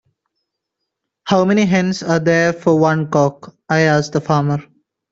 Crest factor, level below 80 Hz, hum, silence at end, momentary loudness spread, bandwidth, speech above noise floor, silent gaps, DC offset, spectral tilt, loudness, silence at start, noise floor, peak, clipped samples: 14 dB; -56 dBFS; none; 0.5 s; 6 LU; 7.8 kHz; 63 dB; none; under 0.1%; -6.5 dB/octave; -16 LUFS; 1.25 s; -78 dBFS; -2 dBFS; under 0.1%